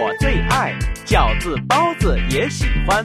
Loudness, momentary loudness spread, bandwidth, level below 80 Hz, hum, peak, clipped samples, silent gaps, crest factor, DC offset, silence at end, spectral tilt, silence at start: -18 LUFS; 5 LU; 14 kHz; -22 dBFS; none; 0 dBFS; under 0.1%; none; 16 dB; under 0.1%; 0 s; -5 dB/octave; 0 s